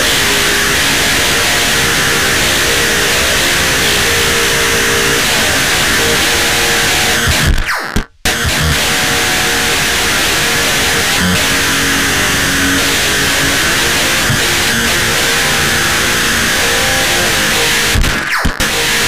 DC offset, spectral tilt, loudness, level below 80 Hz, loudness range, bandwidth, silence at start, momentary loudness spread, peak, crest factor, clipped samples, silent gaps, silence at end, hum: 3%; -2 dB/octave; -10 LUFS; -26 dBFS; 2 LU; 16 kHz; 0 s; 2 LU; -2 dBFS; 12 dB; under 0.1%; none; 0 s; none